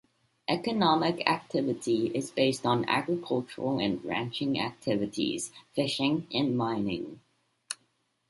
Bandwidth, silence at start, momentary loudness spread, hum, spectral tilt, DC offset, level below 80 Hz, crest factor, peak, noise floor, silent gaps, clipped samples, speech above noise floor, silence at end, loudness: 11.5 kHz; 0.5 s; 10 LU; none; -5 dB/octave; under 0.1%; -66 dBFS; 24 dB; -6 dBFS; -73 dBFS; none; under 0.1%; 44 dB; 0.55 s; -29 LUFS